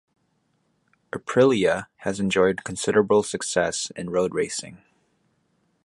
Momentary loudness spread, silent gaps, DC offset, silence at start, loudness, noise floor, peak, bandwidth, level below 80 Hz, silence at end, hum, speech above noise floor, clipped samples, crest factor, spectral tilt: 12 LU; none; under 0.1%; 1.15 s; -23 LUFS; -70 dBFS; -6 dBFS; 11.5 kHz; -58 dBFS; 1.1 s; none; 47 dB; under 0.1%; 20 dB; -4 dB/octave